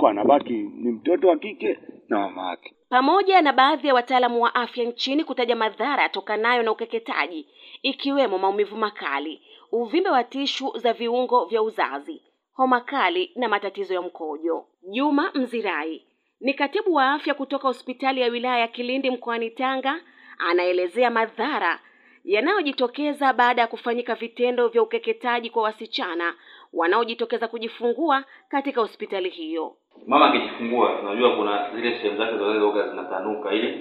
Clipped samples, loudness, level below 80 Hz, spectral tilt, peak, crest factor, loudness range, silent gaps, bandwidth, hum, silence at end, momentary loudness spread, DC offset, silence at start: under 0.1%; -23 LUFS; -82 dBFS; -4.5 dB/octave; -2 dBFS; 20 dB; 4 LU; none; 10.5 kHz; none; 0 s; 10 LU; under 0.1%; 0 s